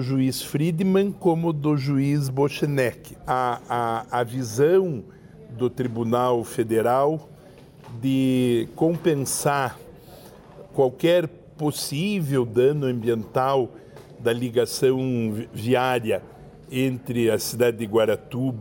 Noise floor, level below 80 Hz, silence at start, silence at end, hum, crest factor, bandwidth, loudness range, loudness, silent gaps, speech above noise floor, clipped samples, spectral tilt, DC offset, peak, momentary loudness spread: -47 dBFS; -56 dBFS; 0 s; 0 s; none; 16 dB; 17 kHz; 2 LU; -23 LUFS; none; 25 dB; under 0.1%; -6 dB/octave; under 0.1%; -8 dBFS; 8 LU